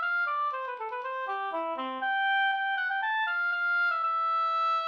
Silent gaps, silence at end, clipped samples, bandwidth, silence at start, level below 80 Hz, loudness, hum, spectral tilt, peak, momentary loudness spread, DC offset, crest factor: none; 0 s; under 0.1%; 7 kHz; 0 s; -84 dBFS; -28 LUFS; none; -1.5 dB/octave; -20 dBFS; 8 LU; under 0.1%; 8 dB